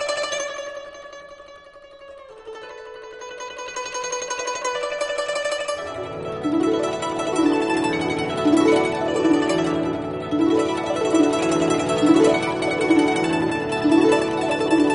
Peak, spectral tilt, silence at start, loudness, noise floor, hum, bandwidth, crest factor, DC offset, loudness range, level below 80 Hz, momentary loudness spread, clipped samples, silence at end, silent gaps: -4 dBFS; -4.5 dB/octave; 0 s; -21 LUFS; -44 dBFS; none; 10.5 kHz; 18 dB; under 0.1%; 13 LU; -54 dBFS; 19 LU; under 0.1%; 0 s; none